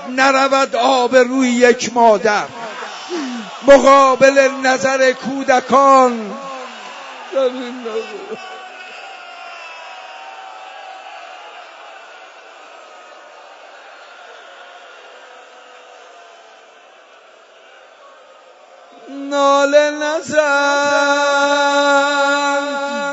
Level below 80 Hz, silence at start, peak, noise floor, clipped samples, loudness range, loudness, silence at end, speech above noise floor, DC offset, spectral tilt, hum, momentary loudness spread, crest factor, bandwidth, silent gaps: -54 dBFS; 0 s; 0 dBFS; -45 dBFS; under 0.1%; 22 LU; -14 LUFS; 0 s; 31 dB; under 0.1%; -2.5 dB/octave; none; 23 LU; 16 dB; 8 kHz; none